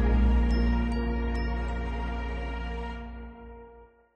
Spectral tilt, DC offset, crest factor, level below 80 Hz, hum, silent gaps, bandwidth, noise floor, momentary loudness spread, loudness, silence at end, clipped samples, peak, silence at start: -8 dB/octave; under 0.1%; 14 dB; -30 dBFS; none; none; 5.6 kHz; -53 dBFS; 20 LU; -30 LUFS; 0.3 s; under 0.1%; -14 dBFS; 0 s